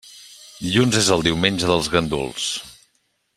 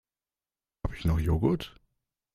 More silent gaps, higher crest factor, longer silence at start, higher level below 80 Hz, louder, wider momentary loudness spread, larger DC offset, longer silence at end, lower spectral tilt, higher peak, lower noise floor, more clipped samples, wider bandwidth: neither; about the same, 20 dB vs 20 dB; second, 0.05 s vs 0.85 s; second, -46 dBFS vs -40 dBFS; first, -19 LUFS vs -30 LUFS; first, 19 LU vs 13 LU; neither; about the same, 0.65 s vs 0.65 s; second, -4 dB/octave vs -8 dB/octave; first, -2 dBFS vs -12 dBFS; second, -67 dBFS vs under -90 dBFS; neither; first, 15.5 kHz vs 13.5 kHz